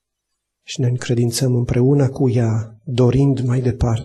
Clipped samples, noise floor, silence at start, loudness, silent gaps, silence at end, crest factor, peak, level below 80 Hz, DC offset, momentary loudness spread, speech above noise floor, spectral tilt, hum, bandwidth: under 0.1%; -77 dBFS; 0.7 s; -18 LUFS; none; 0 s; 12 dB; -6 dBFS; -38 dBFS; under 0.1%; 7 LU; 60 dB; -7 dB/octave; none; 12.5 kHz